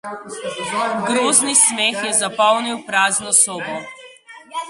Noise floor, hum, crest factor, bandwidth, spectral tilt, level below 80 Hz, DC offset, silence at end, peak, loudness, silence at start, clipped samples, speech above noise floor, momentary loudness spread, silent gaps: -42 dBFS; none; 20 dB; 12 kHz; -0.5 dB/octave; -66 dBFS; under 0.1%; 0 s; 0 dBFS; -16 LUFS; 0.05 s; under 0.1%; 23 dB; 16 LU; none